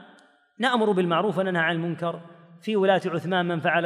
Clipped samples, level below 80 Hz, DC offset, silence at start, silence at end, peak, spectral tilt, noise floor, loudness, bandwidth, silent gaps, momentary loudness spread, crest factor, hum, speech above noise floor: under 0.1%; -78 dBFS; under 0.1%; 0 s; 0 s; -8 dBFS; -6.5 dB/octave; -56 dBFS; -24 LUFS; 11 kHz; none; 9 LU; 16 dB; none; 33 dB